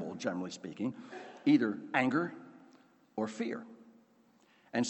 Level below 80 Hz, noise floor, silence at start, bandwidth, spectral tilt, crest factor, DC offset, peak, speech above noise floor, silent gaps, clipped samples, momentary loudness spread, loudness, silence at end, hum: -82 dBFS; -67 dBFS; 0 s; 8.4 kHz; -5.5 dB/octave; 22 dB; under 0.1%; -14 dBFS; 33 dB; none; under 0.1%; 19 LU; -34 LUFS; 0 s; none